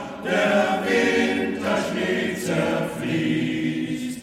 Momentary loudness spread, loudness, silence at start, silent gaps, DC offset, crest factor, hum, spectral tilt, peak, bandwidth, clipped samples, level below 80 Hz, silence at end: 6 LU; -23 LUFS; 0 s; none; under 0.1%; 16 dB; none; -5 dB/octave; -8 dBFS; 16 kHz; under 0.1%; -56 dBFS; 0 s